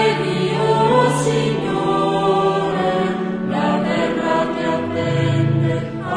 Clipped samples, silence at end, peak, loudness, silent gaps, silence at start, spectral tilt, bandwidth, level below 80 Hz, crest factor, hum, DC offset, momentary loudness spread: under 0.1%; 0 s; -2 dBFS; -18 LUFS; none; 0 s; -6.5 dB/octave; 11 kHz; -48 dBFS; 14 dB; none; under 0.1%; 5 LU